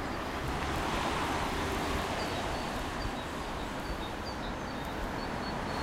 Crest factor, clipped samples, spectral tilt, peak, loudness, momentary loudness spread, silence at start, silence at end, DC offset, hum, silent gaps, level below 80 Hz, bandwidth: 16 dB; under 0.1%; -4.5 dB/octave; -18 dBFS; -35 LUFS; 5 LU; 0 s; 0 s; under 0.1%; none; none; -44 dBFS; 16 kHz